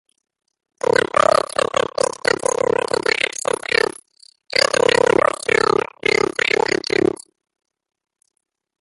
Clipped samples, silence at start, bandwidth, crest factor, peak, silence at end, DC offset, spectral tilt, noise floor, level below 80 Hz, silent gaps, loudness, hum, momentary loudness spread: under 0.1%; 0.95 s; 11.5 kHz; 20 dB; 0 dBFS; 1.7 s; under 0.1%; -2.5 dB/octave; -52 dBFS; -54 dBFS; none; -18 LUFS; none; 6 LU